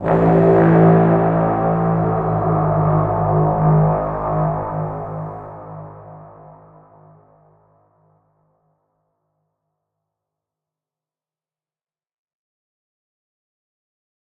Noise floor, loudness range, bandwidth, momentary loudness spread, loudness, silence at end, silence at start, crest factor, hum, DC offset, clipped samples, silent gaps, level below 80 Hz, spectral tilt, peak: under -90 dBFS; 19 LU; 3.3 kHz; 19 LU; -16 LUFS; 8 s; 0 s; 18 dB; none; under 0.1%; under 0.1%; none; -40 dBFS; -12 dB/octave; -2 dBFS